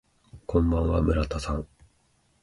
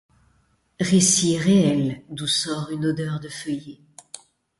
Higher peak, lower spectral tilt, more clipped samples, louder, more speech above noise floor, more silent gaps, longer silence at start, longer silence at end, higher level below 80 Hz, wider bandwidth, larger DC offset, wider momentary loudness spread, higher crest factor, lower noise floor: second, -10 dBFS vs -6 dBFS; first, -7.5 dB/octave vs -4 dB/octave; neither; second, -26 LUFS vs -21 LUFS; about the same, 42 dB vs 43 dB; neither; second, 0.35 s vs 0.8 s; first, 0.75 s vs 0.45 s; first, -34 dBFS vs -58 dBFS; about the same, 11.5 kHz vs 11.5 kHz; neither; second, 15 LU vs 24 LU; about the same, 18 dB vs 18 dB; about the same, -67 dBFS vs -64 dBFS